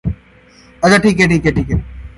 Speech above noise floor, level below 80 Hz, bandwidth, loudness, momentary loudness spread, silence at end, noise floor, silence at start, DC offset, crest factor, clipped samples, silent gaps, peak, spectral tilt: 32 dB; -28 dBFS; 11.5 kHz; -13 LUFS; 13 LU; 0.1 s; -44 dBFS; 0.05 s; under 0.1%; 14 dB; under 0.1%; none; 0 dBFS; -6 dB/octave